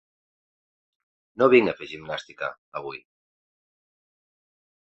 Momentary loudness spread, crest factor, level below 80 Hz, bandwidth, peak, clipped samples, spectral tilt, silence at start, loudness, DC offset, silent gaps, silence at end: 19 LU; 24 dB; -66 dBFS; 7.6 kHz; -4 dBFS; under 0.1%; -6.5 dB/octave; 1.4 s; -23 LUFS; under 0.1%; 2.58-2.72 s; 1.85 s